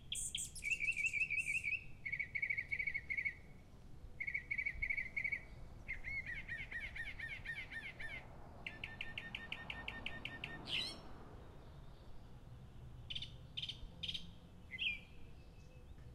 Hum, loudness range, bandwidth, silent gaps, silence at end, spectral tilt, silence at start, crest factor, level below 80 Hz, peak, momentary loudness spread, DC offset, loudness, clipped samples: none; 9 LU; 15.5 kHz; none; 0 s; -1.5 dB/octave; 0 s; 18 dB; -58 dBFS; -28 dBFS; 22 LU; under 0.1%; -42 LUFS; under 0.1%